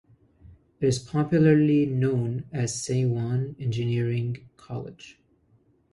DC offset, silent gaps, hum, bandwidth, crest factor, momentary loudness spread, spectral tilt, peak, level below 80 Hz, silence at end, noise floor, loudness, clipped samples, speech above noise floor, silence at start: under 0.1%; none; none; 11.5 kHz; 18 dB; 17 LU; -7 dB/octave; -8 dBFS; -56 dBFS; 0.8 s; -63 dBFS; -25 LUFS; under 0.1%; 39 dB; 0.45 s